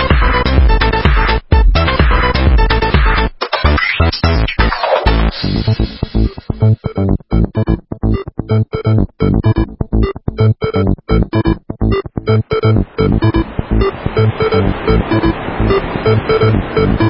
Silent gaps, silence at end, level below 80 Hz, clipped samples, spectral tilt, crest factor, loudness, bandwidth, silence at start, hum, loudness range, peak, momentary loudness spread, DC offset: none; 0 s; -16 dBFS; under 0.1%; -10 dB/octave; 12 dB; -14 LUFS; 5.8 kHz; 0 s; none; 3 LU; 0 dBFS; 5 LU; under 0.1%